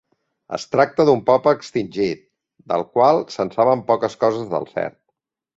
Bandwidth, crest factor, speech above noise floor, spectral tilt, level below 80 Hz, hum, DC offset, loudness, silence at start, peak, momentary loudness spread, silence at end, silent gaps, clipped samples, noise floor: 7.8 kHz; 18 dB; 57 dB; -6 dB/octave; -60 dBFS; none; under 0.1%; -19 LUFS; 0.5 s; -2 dBFS; 11 LU; 0.7 s; none; under 0.1%; -76 dBFS